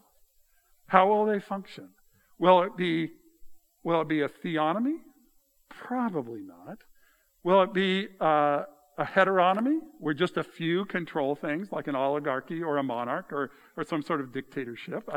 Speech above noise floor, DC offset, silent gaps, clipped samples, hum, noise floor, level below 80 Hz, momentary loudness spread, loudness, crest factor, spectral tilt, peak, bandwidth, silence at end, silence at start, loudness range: 37 dB; under 0.1%; none; under 0.1%; none; -65 dBFS; -72 dBFS; 15 LU; -28 LUFS; 26 dB; -7 dB/octave; -2 dBFS; 14.5 kHz; 0 s; 0.9 s; 5 LU